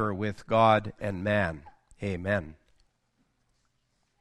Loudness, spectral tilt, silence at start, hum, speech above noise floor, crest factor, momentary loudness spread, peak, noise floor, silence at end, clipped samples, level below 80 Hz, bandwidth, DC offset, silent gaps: -28 LUFS; -7 dB/octave; 0 s; none; 47 dB; 22 dB; 15 LU; -8 dBFS; -74 dBFS; 1.7 s; under 0.1%; -58 dBFS; 10.5 kHz; under 0.1%; none